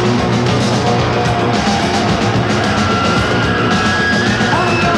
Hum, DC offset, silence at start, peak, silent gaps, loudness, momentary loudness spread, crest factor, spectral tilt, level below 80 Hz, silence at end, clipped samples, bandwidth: none; under 0.1%; 0 s; -2 dBFS; none; -13 LUFS; 1 LU; 12 dB; -5 dB/octave; -32 dBFS; 0 s; under 0.1%; 12 kHz